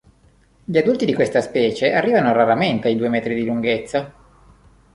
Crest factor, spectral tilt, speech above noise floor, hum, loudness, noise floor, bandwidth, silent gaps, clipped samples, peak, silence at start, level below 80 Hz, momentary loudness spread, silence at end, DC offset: 16 dB; -6 dB/octave; 37 dB; none; -18 LUFS; -55 dBFS; 11 kHz; none; under 0.1%; -2 dBFS; 0.7 s; -54 dBFS; 7 LU; 0.85 s; under 0.1%